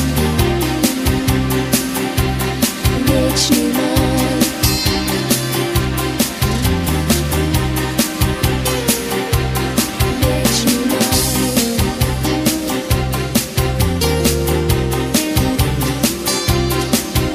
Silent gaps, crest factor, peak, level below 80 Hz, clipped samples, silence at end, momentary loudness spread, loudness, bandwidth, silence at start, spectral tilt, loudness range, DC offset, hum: none; 16 dB; 0 dBFS; -26 dBFS; under 0.1%; 0 s; 3 LU; -16 LUFS; 16 kHz; 0 s; -4.5 dB/octave; 1 LU; under 0.1%; none